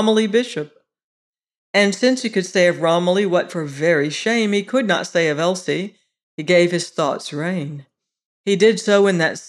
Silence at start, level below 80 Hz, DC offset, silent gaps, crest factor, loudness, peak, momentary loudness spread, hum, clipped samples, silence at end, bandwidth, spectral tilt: 0 s; -72 dBFS; under 0.1%; 1.04-1.33 s, 1.58-1.74 s, 6.23-6.38 s, 8.25-8.44 s; 16 dB; -18 LUFS; -4 dBFS; 11 LU; none; under 0.1%; 0 s; 12 kHz; -4.5 dB/octave